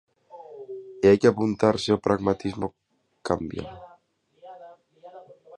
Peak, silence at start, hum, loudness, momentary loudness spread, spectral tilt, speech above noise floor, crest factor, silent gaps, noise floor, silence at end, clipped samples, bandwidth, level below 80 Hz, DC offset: -4 dBFS; 0.35 s; none; -23 LUFS; 23 LU; -6.5 dB/octave; 40 dB; 22 dB; none; -62 dBFS; 0.35 s; under 0.1%; 11 kHz; -54 dBFS; under 0.1%